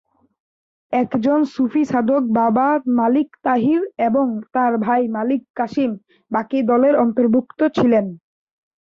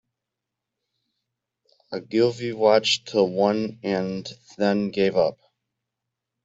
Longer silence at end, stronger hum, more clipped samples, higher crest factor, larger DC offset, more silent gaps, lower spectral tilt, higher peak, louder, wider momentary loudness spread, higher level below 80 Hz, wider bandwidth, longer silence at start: second, 0.65 s vs 1.1 s; neither; neither; second, 14 dB vs 20 dB; neither; first, 5.50-5.54 s vs none; first, -8 dB/octave vs -5 dB/octave; about the same, -4 dBFS vs -4 dBFS; first, -18 LUFS vs -23 LUFS; second, 7 LU vs 12 LU; first, -60 dBFS vs -68 dBFS; second, 7 kHz vs 8.2 kHz; second, 0.9 s vs 1.9 s